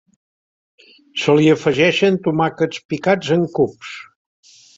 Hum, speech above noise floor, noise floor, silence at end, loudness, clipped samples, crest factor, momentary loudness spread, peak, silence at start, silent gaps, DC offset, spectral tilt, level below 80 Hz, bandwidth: none; over 74 dB; under -90 dBFS; 0.75 s; -17 LUFS; under 0.1%; 18 dB; 14 LU; -2 dBFS; 1.15 s; 2.85-2.89 s; under 0.1%; -6 dB/octave; -58 dBFS; 7.8 kHz